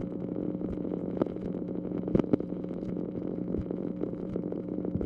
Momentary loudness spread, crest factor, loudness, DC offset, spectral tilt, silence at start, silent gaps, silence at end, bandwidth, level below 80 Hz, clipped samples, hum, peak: 6 LU; 22 dB; -33 LUFS; under 0.1%; -11 dB/octave; 0 s; none; 0 s; 5.2 kHz; -52 dBFS; under 0.1%; none; -10 dBFS